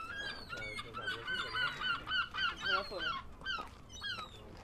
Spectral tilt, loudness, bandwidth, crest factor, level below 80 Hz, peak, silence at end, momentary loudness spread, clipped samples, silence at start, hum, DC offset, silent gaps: -2.5 dB/octave; -38 LUFS; 14.5 kHz; 18 dB; -58 dBFS; -22 dBFS; 0 s; 8 LU; under 0.1%; 0 s; none; under 0.1%; none